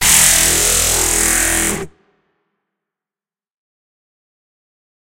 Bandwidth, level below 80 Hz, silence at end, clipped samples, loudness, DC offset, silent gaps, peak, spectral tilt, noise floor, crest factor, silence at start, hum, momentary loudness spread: over 20 kHz; -34 dBFS; 3.3 s; under 0.1%; -11 LUFS; under 0.1%; none; 0 dBFS; -0.5 dB/octave; under -90 dBFS; 18 dB; 0 s; none; 9 LU